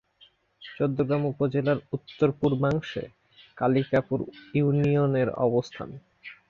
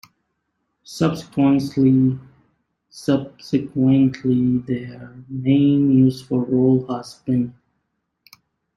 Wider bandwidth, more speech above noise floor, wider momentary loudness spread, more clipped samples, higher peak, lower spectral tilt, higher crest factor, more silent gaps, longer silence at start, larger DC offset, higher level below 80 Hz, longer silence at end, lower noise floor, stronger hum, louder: second, 7 kHz vs 11.5 kHz; second, 35 dB vs 55 dB; first, 17 LU vs 13 LU; neither; second, -10 dBFS vs -4 dBFS; about the same, -8.5 dB/octave vs -8 dB/octave; about the same, 16 dB vs 14 dB; neither; second, 0.6 s vs 0.9 s; neither; about the same, -58 dBFS vs -56 dBFS; second, 0.15 s vs 1.25 s; second, -60 dBFS vs -74 dBFS; neither; second, -26 LUFS vs -19 LUFS